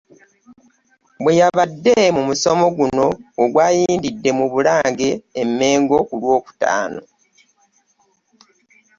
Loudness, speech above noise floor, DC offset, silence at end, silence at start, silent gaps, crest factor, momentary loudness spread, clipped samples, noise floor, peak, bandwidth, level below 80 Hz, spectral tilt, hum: -17 LUFS; 46 dB; under 0.1%; 2 s; 1.2 s; none; 16 dB; 7 LU; under 0.1%; -62 dBFS; -2 dBFS; 7.6 kHz; -56 dBFS; -4.5 dB/octave; none